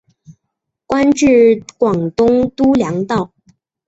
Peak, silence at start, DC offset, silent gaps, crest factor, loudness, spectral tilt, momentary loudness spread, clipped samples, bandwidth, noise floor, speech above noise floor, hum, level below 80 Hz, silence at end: -2 dBFS; 0.3 s; under 0.1%; none; 12 dB; -14 LUFS; -6 dB/octave; 10 LU; under 0.1%; 8 kHz; -76 dBFS; 63 dB; none; -46 dBFS; 0.6 s